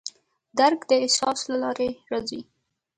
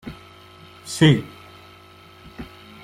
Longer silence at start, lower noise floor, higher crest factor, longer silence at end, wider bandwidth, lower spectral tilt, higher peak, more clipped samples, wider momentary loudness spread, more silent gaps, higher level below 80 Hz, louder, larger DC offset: about the same, 0.05 s vs 0.05 s; second, -43 dBFS vs -47 dBFS; about the same, 20 dB vs 22 dB; first, 0.55 s vs 0.4 s; second, 11.5 kHz vs 14 kHz; second, -2 dB/octave vs -5.5 dB/octave; second, -6 dBFS vs -2 dBFS; neither; second, 14 LU vs 27 LU; neither; second, -64 dBFS vs -52 dBFS; second, -24 LUFS vs -19 LUFS; neither